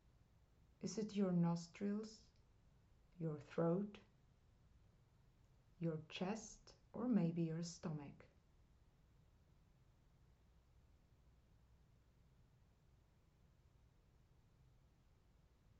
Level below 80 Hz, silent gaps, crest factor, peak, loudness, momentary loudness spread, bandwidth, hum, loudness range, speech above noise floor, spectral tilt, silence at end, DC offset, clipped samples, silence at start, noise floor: -74 dBFS; none; 22 dB; -26 dBFS; -44 LUFS; 16 LU; 8 kHz; none; 7 LU; 30 dB; -7.5 dB/octave; 7.55 s; under 0.1%; under 0.1%; 0.8 s; -73 dBFS